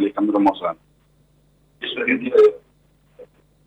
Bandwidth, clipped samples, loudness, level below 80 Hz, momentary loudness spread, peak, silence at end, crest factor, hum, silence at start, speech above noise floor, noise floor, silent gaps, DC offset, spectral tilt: 5.8 kHz; under 0.1%; -19 LUFS; -62 dBFS; 17 LU; -6 dBFS; 0.4 s; 14 dB; none; 0 s; 40 dB; -58 dBFS; none; under 0.1%; -6.5 dB/octave